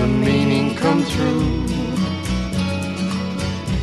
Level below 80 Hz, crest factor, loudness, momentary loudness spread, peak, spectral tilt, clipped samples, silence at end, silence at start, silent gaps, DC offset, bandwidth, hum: -32 dBFS; 16 dB; -20 LUFS; 6 LU; -4 dBFS; -6 dB/octave; under 0.1%; 0 s; 0 s; none; 0.3%; 12.5 kHz; none